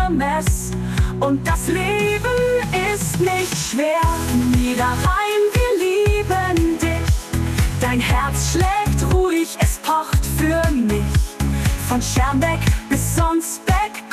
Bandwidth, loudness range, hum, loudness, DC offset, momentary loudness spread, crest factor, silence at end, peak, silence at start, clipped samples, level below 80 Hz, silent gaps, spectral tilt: 14 kHz; 1 LU; none; -19 LUFS; under 0.1%; 3 LU; 12 dB; 0 s; -6 dBFS; 0 s; under 0.1%; -24 dBFS; none; -5 dB/octave